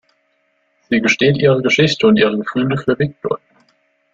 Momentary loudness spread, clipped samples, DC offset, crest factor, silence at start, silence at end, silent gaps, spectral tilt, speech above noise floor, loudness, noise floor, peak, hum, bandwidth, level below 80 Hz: 9 LU; under 0.1%; under 0.1%; 14 dB; 0.9 s; 0.75 s; none; -5.5 dB/octave; 49 dB; -15 LUFS; -63 dBFS; -2 dBFS; none; 7.8 kHz; -52 dBFS